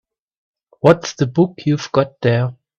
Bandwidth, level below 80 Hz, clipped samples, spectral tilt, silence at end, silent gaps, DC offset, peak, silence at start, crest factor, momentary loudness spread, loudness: 8.2 kHz; -54 dBFS; under 0.1%; -6.5 dB/octave; 0.25 s; none; under 0.1%; 0 dBFS; 0.85 s; 18 dB; 6 LU; -17 LUFS